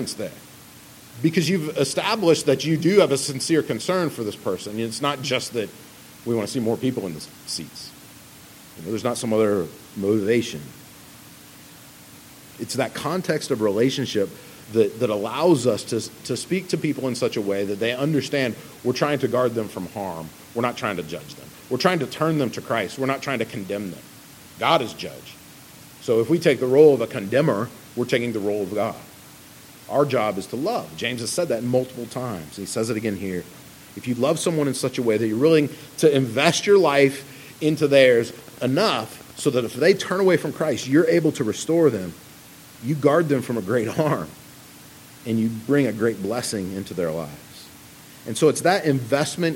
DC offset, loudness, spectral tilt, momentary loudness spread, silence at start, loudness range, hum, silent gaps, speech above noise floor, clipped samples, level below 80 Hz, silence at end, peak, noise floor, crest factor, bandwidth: under 0.1%; -22 LUFS; -5 dB/octave; 17 LU; 0 s; 7 LU; none; none; 23 dB; under 0.1%; -64 dBFS; 0 s; 0 dBFS; -45 dBFS; 22 dB; 17 kHz